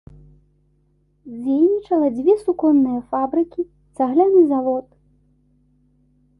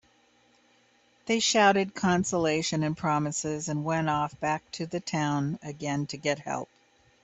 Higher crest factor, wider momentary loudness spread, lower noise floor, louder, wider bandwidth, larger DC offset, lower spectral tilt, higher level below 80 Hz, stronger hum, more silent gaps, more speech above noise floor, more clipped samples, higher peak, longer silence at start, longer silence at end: second, 16 dB vs 22 dB; about the same, 13 LU vs 11 LU; about the same, -61 dBFS vs -64 dBFS; first, -18 LUFS vs -28 LUFS; first, 10.5 kHz vs 8.4 kHz; neither; first, -9 dB/octave vs -4 dB/octave; first, -56 dBFS vs -62 dBFS; first, 50 Hz at -55 dBFS vs 60 Hz at -70 dBFS; neither; first, 44 dB vs 37 dB; neither; first, -4 dBFS vs -8 dBFS; about the same, 1.25 s vs 1.25 s; first, 1.6 s vs 0.6 s